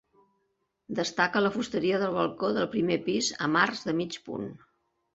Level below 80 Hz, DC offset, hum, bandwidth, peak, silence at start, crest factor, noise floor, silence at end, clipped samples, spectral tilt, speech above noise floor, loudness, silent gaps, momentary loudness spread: -66 dBFS; under 0.1%; none; 8.2 kHz; -8 dBFS; 0.9 s; 22 dB; -77 dBFS; 0.55 s; under 0.1%; -4 dB/octave; 49 dB; -28 LUFS; none; 11 LU